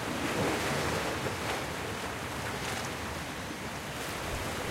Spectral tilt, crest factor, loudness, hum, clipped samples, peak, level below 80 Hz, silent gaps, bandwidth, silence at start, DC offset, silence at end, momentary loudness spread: -4 dB/octave; 16 dB; -34 LUFS; none; under 0.1%; -18 dBFS; -50 dBFS; none; 16 kHz; 0 s; under 0.1%; 0 s; 7 LU